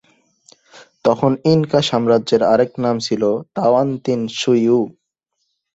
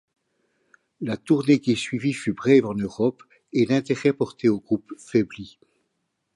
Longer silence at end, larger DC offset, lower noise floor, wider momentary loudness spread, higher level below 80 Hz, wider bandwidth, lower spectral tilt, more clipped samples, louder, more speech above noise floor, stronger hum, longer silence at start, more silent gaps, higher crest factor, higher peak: about the same, 0.85 s vs 0.9 s; neither; second, -72 dBFS vs -76 dBFS; second, 5 LU vs 12 LU; about the same, -58 dBFS vs -62 dBFS; second, 8 kHz vs 11.5 kHz; about the same, -6 dB/octave vs -6.5 dB/octave; neither; first, -17 LUFS vs -23 LUFS; about the same, 57 dB vs 54 dB; neither; second, 0.75 s vs 1 s; neither; about the same, 16 dB vs 18 dB; first, 0 dBFS vs -4 dBFS